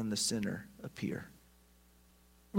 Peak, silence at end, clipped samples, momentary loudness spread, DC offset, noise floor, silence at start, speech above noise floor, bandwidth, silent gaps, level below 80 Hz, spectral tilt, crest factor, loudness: -20 dBFS; 0 s; under 0.1%; 15 LU; under 0.1%; -65 dBFS; 0 s; 27 dB; 16 kHz; none; -66 dBFS; -3.5 dB/octave; 20 dB; -38 LUFS